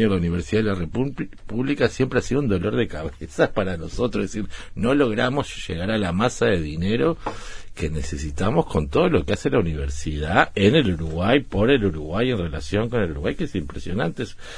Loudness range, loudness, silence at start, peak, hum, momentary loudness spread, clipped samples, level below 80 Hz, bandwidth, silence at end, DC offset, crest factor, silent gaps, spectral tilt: 3 LU; -23 LUFS; 0 s; 0 dBFS; none; 10 LU; under 0.1%; -36 dBFS; 10.5 kHz; 0 s; under 0.1%; 22 dB; none; -6 dB/octave